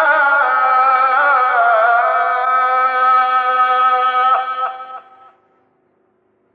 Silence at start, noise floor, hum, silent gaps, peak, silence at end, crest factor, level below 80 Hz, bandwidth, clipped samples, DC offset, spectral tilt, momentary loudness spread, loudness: 0 s; -60 dBFS; none; none; -4 dBFS; 1.55 s; 12 dB; -86 dBFS; 4.9 kHz; under 0.1%; under 0.1%; -2.5 dB/octave; 6 LU; -13 LUFS